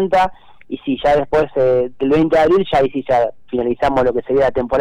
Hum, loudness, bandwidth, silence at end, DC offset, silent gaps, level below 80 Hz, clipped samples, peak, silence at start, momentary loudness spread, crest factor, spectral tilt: none; -16 LUFS; 10.5 kHz; 0 s; under 0.1%; none; -38 dBFS; under 0.1%; -8 dBFS; 0 s; 7 LU; 8 dB; -7 dB/octave